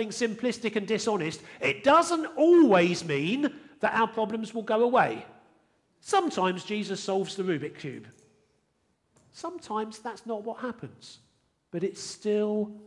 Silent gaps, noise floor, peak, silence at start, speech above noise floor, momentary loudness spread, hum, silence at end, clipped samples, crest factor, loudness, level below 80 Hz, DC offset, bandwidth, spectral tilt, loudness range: none; -73 dBFS; -10 dBFS; 0 s; 46 dB; 18 LU; none; 0.05 s; under 0.1%; 18 dB; -27 LUFS; -74 dBFS; under 0.1%; 11.5 kHz; -5 dB/octave; 14 LU